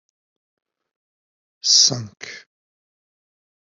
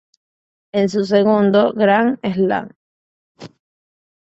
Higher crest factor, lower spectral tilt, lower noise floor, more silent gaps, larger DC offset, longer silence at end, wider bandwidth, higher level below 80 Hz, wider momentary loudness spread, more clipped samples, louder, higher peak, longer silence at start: first, 24 dB vs 16 dB; second, -0.5 dB/octave vs -7 dB/octave; about the same, under -90 dBFS vs under -90 dBFS; second, none vs 2.76-3.35 s; neither; first, 1.3 s vs 0.75 s; about the same, 8.2 kHz vs 7.8 kHz; second, -72 dBFS vs -62 dBFS; first, 23 LU vs 9 LU; neither; about the same, -14 LUFS vs -16 LUFS; about the same, -2 dBFS vs -2 dBFS; first, 1.65 s vs 0.75 s